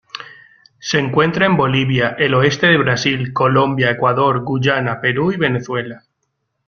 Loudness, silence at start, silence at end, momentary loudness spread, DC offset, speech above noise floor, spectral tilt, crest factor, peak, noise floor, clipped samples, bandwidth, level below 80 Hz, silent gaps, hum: -15 LUFS; 0.15 s; 0.7 s; 9 LU; under 0.1%; 56 dB; -5.5 dB/octave; 16 dB; 0 dBFS; -71 dBFS; under 0.1%; 7 kHz; -50 dBFS; none; none